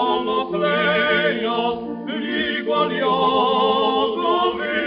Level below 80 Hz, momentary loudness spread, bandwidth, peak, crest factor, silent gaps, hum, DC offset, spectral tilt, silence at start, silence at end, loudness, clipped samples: -56 dBFS; 6 LU; 5.4 kHz; -6 dBFS; 14 dB; none; none; under 0.1%; -1.5 dB/octave; 0 s; 0 s; -20 LUFS; under 0.1%